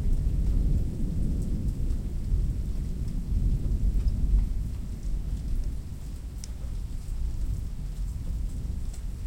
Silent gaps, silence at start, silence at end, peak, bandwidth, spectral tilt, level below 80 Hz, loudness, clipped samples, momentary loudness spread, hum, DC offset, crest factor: none; 0 s; 0 s; -14 dBFS; 11 kHz; -7.5 dB/octave; -28 dBFS; -32 LUFS; under 0.1%; 9 LU; none; under 0.1%; 14 dB